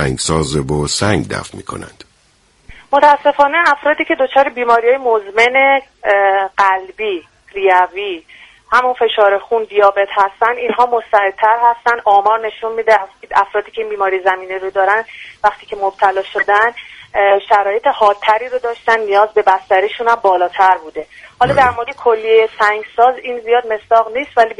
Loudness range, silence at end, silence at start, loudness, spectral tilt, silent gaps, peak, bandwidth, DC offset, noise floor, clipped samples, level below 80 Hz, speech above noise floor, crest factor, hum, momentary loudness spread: 3 LU; 0.05 s; 0 s; -13 LUFS; -4 dB/octave; none; 0 dBFS; 11.5 kHz; under 0.1%; -54 dBFS; under 0.1%; -44 dBFS; 40 dB; 14 dB; none; 9 LU